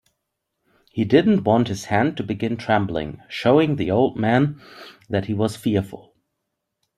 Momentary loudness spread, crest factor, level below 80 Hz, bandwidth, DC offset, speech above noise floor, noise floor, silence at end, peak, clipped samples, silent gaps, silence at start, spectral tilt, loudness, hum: 11 LU; 18 dB; -54 dBFS; 14 kHz; under 0.1%; 58 dB; -78 dBFS; 1 s; -2 dBFS; under 0.1%; none; 0.95 s; -7 dB/octave; -21 LUFS; none